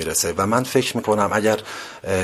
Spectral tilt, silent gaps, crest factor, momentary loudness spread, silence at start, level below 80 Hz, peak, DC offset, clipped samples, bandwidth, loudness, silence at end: -4 dB/octave; none; 18 dB; 8 LU; 0 s; -46 dBFS; -2 dBFS; under 0.1%; under 0.1%; 15.5 kHz; -20 LUFS; 0 s